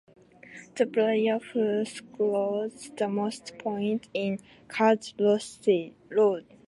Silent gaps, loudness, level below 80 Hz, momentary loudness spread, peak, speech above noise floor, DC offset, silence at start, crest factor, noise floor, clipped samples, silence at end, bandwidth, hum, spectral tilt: none; -28 LUFS; -74 dBFS; 11 LU; -8 dBFS; 22 dB; under 0.1%; 0.5 s; 18 dB; -49 dBFS; under 0.1%; 0.25 s; 11.5 kHz; none; -5.5 dB/octave